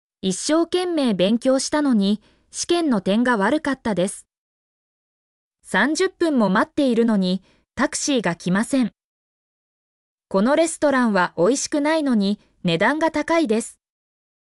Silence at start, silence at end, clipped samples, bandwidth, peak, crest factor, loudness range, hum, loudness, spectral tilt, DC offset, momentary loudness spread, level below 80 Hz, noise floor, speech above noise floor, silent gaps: 0.25 s; 0.9 s; under 0.1%; 12 kHz; -8 dBFS; 14 dB; 3 LU; none; -20 LUFS; -4.5 dB/octave; under 0.1%; 7 LU; -58 dBFS; under -90 dBFS; over 70 dB; 4.38-5.51 s, 9.04-10.18 s